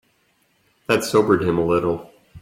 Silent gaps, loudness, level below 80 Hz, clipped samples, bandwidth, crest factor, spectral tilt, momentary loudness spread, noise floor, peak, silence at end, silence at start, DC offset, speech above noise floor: none; -20 LUFS; -52 dBFS; under 0.1%; 16 kHz; 18 dB; -5.5 dB/octave; 11 LU; -64 dBFS; -2 dBFS; 0 s; 0.9 s; under 0.1%; 45 dB